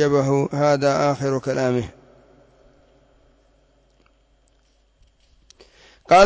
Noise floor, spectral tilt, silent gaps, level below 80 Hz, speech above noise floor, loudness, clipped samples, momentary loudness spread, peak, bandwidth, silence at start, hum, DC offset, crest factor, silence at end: -61 dBFS; -6 dB/octave; none; -54 dBFS; 41 dB; -20 LUFS; under 0.1%; 6 LU; -4 dBFS; 8 kHz; 0 s; none; under 0.1%; 18 dB; 0 s